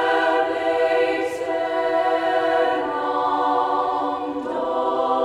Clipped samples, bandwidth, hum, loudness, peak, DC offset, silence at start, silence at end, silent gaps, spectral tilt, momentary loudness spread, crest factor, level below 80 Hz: under 0.1%; 12 kHz; none; -21 LUFS; -8 dBFS; under 0.1%; 0 s; 0 s; none; -4.5 dB/octave; 5 LU; 14 dB; -60 dBFS